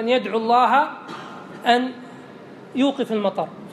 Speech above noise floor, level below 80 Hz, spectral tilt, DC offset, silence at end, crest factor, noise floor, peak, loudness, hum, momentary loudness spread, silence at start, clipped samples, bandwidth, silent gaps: 21 dB; -78 dBFS; -5 dB/octave; under 0.1%; 0 s; 20 dB; -41 dBFS; -2 dBFS; -21 LUFS; none; 23 LU; 0 s; under 0.1%; 13.5 kHz; none